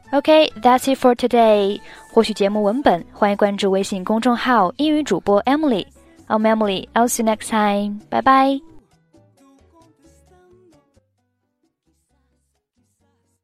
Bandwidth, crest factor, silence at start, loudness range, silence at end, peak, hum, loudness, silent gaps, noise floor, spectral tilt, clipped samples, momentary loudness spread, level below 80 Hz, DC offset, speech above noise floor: 15.5 kHz; 18 dB; 0.1 s; 5 LU; 4.65 s; 0 dBFS; none; -17 LUFS; none; -70 dBFS; -4.5 dB/octave; under 0.1%; 7 LU; -54 dBFS; under 0.1%; 53 dB